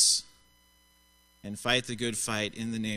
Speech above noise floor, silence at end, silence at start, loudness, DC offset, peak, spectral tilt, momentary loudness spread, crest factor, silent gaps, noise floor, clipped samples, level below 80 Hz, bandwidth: 32 dB; 0 s; 0 s; -29 LUFS; under 0.1%; -10 dBFS; -2 dB/octave; 11 LU; 22 dB; none; -64 dBFS; under 0.1%; -60 dBFS; 15.5 kHz